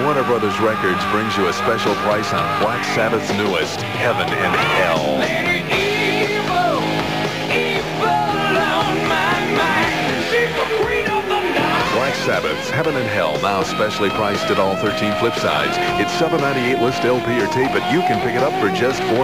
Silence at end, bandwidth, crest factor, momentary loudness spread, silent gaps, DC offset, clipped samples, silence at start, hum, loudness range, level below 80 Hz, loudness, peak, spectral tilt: 0 s; 16 kHz; 14 dB; 2 LU; none; 0.5%; under 0.1%; 0 s; none; 1 LU; -46 dBFS; -18 LUFS; -4 dBFS; -4.5 dB/octave